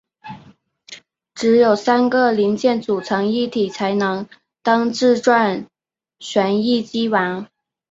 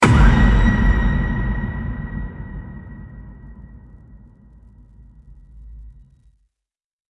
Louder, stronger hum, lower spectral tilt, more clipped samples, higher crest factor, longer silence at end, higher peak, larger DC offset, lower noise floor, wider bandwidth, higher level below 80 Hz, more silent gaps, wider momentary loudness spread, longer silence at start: about the same, -18 LUFS vs -19 LUFS; neither; second, -5 dB/octave vs -7 dB/octave; neither; about the same, 16 dB vs 18 dB; second, 0.45 s vs 1.2 s; about the same, -2 dBFS vs -2 dBFS; neither; second, -50 dBFS vs -85 dBFS; second, 8 kHz vs 11.5 kHz; second, -64 dBFS vs -22 dBFS; neither; second, 21 LU vs 27 LU; first, 0.25 s vs 0 s